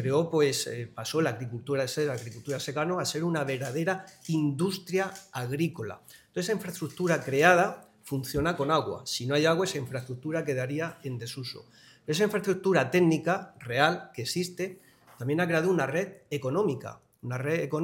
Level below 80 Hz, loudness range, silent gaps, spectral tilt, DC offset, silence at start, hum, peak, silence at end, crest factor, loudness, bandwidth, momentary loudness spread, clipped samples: -62 dBFS; 4 LU; none; -5 dB/octave; under 0.1%; 0 s; none; -6 dBFS; 0 s; 24 dB; -29 LUFS; 17 kHz; 12 LU; under 0.1%